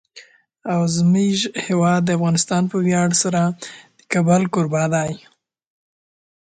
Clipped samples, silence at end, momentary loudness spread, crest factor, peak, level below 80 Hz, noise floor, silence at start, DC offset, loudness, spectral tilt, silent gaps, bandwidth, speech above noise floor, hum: under 0.1%; 1.3 s; 9 LU; 18 dB; -2 dBFS; -58 dBFS; -47 dBFS; 0.15 s; under 0.1%; -18 LUFS; -5 dB/octave; none; 9.4 kHz; 29 dB; none